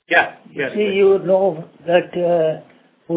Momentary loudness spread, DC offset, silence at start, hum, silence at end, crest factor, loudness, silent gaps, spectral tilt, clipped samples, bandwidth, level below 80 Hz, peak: 10 LU; under 0.1%; 0.1 s; none; 0 s; 18 dB; -18 LUFS; none; -9.5 dB/octave; under 0.1%; 4 kHz; -62 dBFS; 0 dBFS